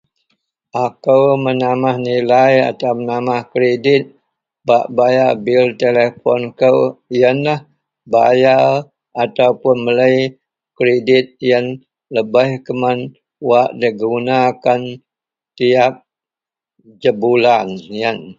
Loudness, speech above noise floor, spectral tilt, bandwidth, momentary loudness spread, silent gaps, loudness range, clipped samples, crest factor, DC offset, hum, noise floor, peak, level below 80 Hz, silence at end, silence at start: -14 LUFS; 75 dB; -7 dB/octave; 7.6 kHz; 9 LU; none; 3 LU; under 0.1%; 14 dB; under 0.1%; none; -88 dBFS; 0 dBFS; -60 dBFS; 0.05 s; 0.75 s